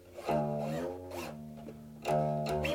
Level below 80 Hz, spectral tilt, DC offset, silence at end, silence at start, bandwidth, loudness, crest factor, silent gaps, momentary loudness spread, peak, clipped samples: -56 dBFS; -6.5 dB/octave; under 0.1%; 0 s; 0 s; 19 kHz; -35 LUFS; 14 dB; none; 15 LU; -20 dBFS; under 0.1%